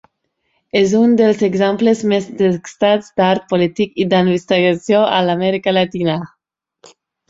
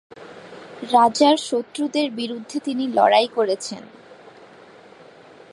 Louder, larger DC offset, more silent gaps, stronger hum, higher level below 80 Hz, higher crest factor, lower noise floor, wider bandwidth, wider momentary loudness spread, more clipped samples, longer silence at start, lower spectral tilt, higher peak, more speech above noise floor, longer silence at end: first, -15 LUFS vs -20 LUFS; neither; neither; neither; first, -56 dBFS vs -74 dBFS; second, 14 dB vs 20 dB; first, -70 dBFS vs -46 dBFS; second, 7.8 kHz vs 11.5 kHz; second, 6 LU vs 24 LU; neither; first, 0.75 s vs 0.15 s; first, -6 dB/octave vs -3.5 dB/octave; about the same, -2 dBFS vs -2 dBFS; first, 55 dB vs 26 dB; second, 1.05 s vs 1.4 s